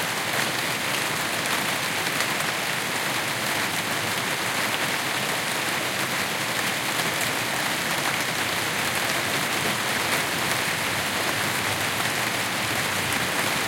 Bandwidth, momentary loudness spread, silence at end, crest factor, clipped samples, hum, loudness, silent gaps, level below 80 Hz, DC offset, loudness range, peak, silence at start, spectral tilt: 17 kHz; 1 LU; 0 s; 22 dB; under 0.1%; none; -24 LUFS; none; -62 dBFS; under 0.1%; 1 LU; -4 dBFS; 0 s; -2 dB/octave